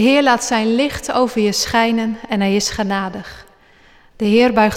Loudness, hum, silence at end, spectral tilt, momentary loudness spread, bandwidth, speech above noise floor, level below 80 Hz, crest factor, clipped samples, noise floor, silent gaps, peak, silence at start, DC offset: -16 LUFS; none; 0 s; -4 dB/octave; 9 LU; 16 kHz; 33 dB; -44 dBFS; 14 dB; under 0.1%; -48 dBFS; none; -4 dBFS; 0 s; under 0.1%